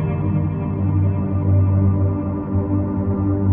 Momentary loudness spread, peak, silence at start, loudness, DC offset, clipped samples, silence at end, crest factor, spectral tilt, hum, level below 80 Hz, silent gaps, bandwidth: 5 LU; -8 dBFS; 0 s; -20 LUFS; under 0.1%; under 0.1%; 0 s; 10 dB; -14 dB/octave; none; -38 dBFS; none; 2.8 kHz